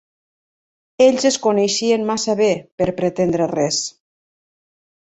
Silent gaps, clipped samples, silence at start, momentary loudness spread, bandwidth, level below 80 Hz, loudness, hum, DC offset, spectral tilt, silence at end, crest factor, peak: 2.72-2.78 s; under 0.1%; 1 s; 6 LU; 8.4 kHz; -54 dBFS; -18 LUFS; none; under 0.1%; -4 dB/octave; 1.25 s; 18 dB; -2 dBFS